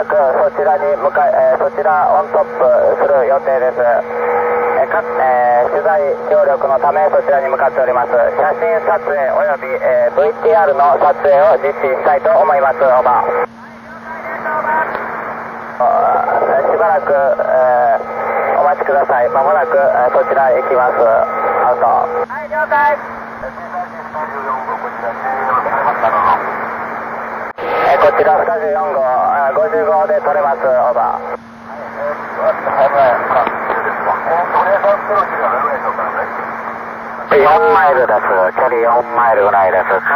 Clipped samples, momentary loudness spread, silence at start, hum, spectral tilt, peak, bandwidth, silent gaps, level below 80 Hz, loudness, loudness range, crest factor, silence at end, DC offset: under 0.1%; 11 LU; 0 s; none; -6.5 dB/octave; -4 dBFS; 17.5 kHz; none; -52 dBFS; -13 LUFS; 5 LU; 10 dB; 0 s; under 0.1%